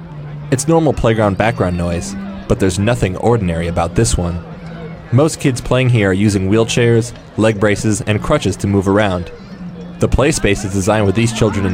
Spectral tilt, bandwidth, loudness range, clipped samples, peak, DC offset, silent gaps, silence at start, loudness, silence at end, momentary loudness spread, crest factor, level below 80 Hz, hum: -5.5 dB/octave; 16 kHz; 2 LU; under 0.1%; -2 dBFS; under 0.1%; none; 0 s; -15 LUFS; 0 s; 13 LU; 14 dB; -30 dBFS; none